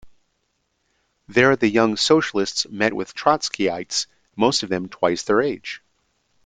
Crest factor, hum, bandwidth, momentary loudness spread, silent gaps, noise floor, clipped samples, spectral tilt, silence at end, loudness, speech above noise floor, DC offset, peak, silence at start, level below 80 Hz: 20 dB; none; 9.6 kHz; 9 LU; none; -71 dBFS; under 0.1%; -3.5 dB/octave; 0.7 s; -20 LUFS; 51 dB; under 0.1%; -2 dBFS; 0.05 s; -60 dBFS